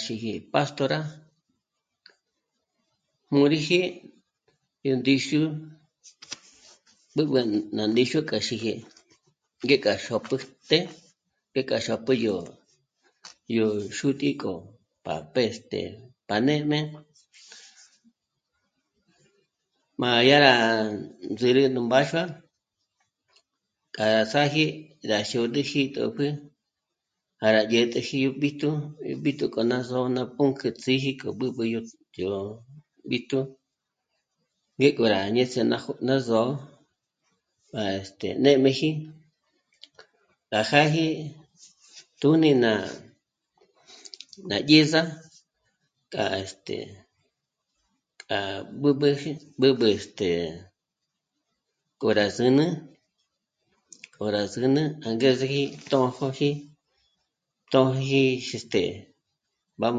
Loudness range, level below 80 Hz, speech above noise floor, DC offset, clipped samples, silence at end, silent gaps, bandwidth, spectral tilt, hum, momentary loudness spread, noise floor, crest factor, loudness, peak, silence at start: 6 LU; -64 dBFS; 59 dB; under 0.1%; under 0.1%; 0 s; none; 9.2 kHz; -5.5 dB/octave; none; 15 LU; -83 dBFS; 26 dB; -25 LUFS; -2 dBFS; 0 s